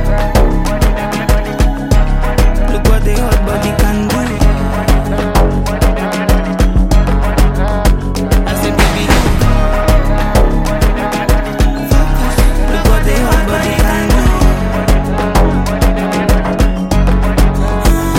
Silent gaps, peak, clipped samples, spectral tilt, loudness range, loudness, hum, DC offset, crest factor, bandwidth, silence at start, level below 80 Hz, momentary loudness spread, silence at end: none; 0 dBFS; under 0.1%; -6 dB/octave; 1 LU; -13 LUFS; none; under 0.1%; 10 dB; 16.5 kHz; 0 s; -12 dBFS; 3 LU; 0 s